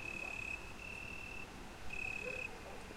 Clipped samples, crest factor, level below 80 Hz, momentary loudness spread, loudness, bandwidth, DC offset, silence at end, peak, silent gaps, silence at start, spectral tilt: under 0.1%; 14 dB; -58 dBFS; 9 LU; -44 LUFS; 16 kHz; under 0.1%; 0 s; -32 dBFS; none; 0 s; -3.5 dB/octave